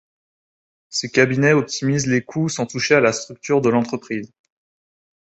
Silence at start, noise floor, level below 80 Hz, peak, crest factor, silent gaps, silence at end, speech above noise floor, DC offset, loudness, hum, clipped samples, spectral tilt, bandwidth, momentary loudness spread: 0.9 s; under -90 dBFS; -60 dBFS; -2 dBFS; 20 dB; none; 1.05 s; over 71 dB; under 0.1%; -19 LUFS; none; under 0.1%; -5 dB/octave; 8.2 kHz; 11 LU